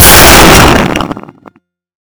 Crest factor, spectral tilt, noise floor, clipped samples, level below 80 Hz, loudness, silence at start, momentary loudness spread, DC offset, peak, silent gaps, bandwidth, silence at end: 6 dB; -3 dB/octave; -39 dBFS; 30%; -16 dBFS; -2 LUFS; 0 s; 19 LU; under 0.1%; 0 dBFS; none; over 20 kHz; 0.9 s